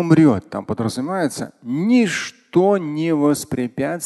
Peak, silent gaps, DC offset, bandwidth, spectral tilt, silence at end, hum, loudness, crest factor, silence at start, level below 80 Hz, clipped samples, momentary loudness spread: 0 dBFS; none; under 0.1%; 12.5 kHz; -6 dB/octave; 0 s; none; -19 LUFS; 18 dB; 0 s; -52 dBFS; under 0.1%; 9 LU